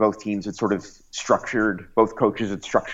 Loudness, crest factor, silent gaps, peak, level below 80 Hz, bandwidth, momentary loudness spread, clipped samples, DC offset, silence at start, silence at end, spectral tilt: -23 LUFS; 18 dB; none; -4 dBFS; -54 dBFS; 8 kHz; 8 LU; under 0.1%; under 0.1%; 0 s; 0 s; -5 dB/octave